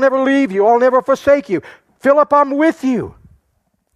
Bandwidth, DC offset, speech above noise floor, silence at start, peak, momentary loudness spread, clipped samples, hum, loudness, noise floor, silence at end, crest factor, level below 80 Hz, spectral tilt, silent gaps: 12 kHz; under 0.1%; 52 dB; 0 s; -2 dBFS; 10 LU; under 0.1%; none; -14 LUFS; -65 dBFS; 0.85 s; 14 dB; -54 dBFS; -6 dB/octave; none